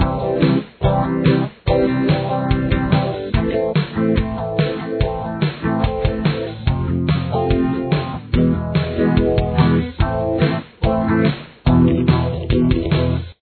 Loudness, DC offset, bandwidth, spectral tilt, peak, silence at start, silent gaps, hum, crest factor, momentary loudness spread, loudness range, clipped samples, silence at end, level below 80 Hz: -18 LUFS; under 0.1%; 4.5 kHz; -11 dB/octave; -2 dBFS; 0 s; none; none; 16 dB; 5 LU; 3 LU; under 0.1%; 0.1 s; -28 dBFS